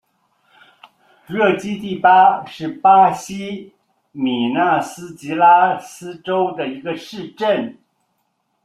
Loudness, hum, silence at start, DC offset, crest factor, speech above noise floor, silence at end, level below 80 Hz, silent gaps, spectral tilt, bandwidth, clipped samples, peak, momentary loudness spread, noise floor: -17 LUFS; none; 1.3 s; under 0.1%; 18 dB; 52 dB; 0.9 s; -64 dBFS; none; -5 dB/octave; 13.5 kHz; under 0.1%; 0 dBFS; 18 LU; -69 dBFS